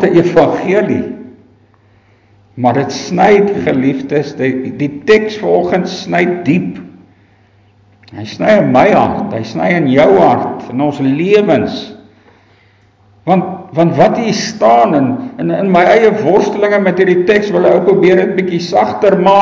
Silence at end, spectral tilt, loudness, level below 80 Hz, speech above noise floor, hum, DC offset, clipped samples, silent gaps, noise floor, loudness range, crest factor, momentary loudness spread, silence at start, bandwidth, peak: 0 s; -6.5 dB/octave; -11 LUFS; -48 dBFS; 38 dB; none; under 0.1%; under 0.1%; none; -48 dBFS; 5 LU; 12 dB; 10 LU; 0 s; 7.6 kHz; 0 dBFS